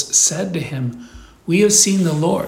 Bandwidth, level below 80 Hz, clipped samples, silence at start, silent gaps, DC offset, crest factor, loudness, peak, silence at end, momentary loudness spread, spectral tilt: 17 kHz; -48 dBFS; under 0.1%; 0 s; none; under 0.1%; 16 dB; -15 LUFS; 0 dBFS; 0 s; 14 LU; -3.5 dB/octave